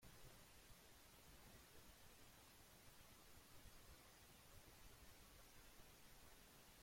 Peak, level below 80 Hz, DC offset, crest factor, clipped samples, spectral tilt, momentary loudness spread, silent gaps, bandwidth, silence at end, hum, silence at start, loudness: -50 dBFS; -72 dBFS; under 0.1%; 16 dB; under 0.1%; -3 dB/octave; 1 LU; none; 16.5 kHz; 0 s; none; 0 s; -66 LUFS